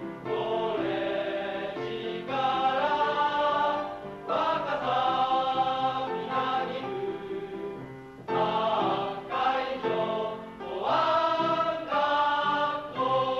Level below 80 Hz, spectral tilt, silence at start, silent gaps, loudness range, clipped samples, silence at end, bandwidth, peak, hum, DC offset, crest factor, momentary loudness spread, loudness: -64 dBFS; -5.5 dB/octave; 0 s; none; 3 LU; under 0.1%; 0 s; 11.5 kHz; -14 dBFS; none; under 0.1%; 14 dB; 10 LU; -28 LUFS